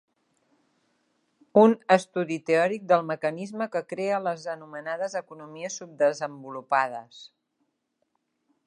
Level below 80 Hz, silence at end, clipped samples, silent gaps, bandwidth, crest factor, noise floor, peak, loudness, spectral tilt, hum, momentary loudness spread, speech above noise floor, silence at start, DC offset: -82 dBFS; 1.4 s; under 0.1%; none; 11 kHz; 24 dB; -77 dBFS; -4 dBFS; -26 LUFS; -5.5 dB/octave; none; 16 LU; 51 dB; 1.55 s; under 0.1%